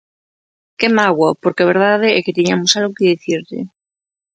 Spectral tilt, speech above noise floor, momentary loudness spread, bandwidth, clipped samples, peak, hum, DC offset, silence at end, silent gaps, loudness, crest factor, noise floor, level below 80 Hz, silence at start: -4 dB/octave; over 76 dB; 9 LU; 9 kHz; under 0.1%; 0 dBFS; none; under 0.1%; 0.65 s; none; -14 LUFS; 16 dB; under -90 dBFS; -62 dBFS; 0.8 s